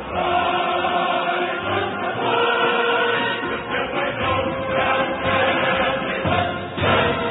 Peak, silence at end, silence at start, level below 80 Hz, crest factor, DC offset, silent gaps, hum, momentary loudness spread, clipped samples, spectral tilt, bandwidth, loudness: -6 dBFS; 0 s; 0 s; -46 dBFS; 14 dB; under 0.1%; none; none; 5 LU; under 0.1%; -10 dB/octave; 4.1 kHz; -20 LUFS